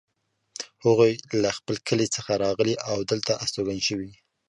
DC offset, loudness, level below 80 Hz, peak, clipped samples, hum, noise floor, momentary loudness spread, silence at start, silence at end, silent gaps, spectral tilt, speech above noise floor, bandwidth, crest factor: under 0.1%; -25 LUFS; -58 dBFS; -6 dBFS; under 0.1%; none; -49 dBFS; 14 LU; 0.6 s; 0.35 s; none; -4.5 dB/octave; 24 dB; 11.5 kHz; 20 dB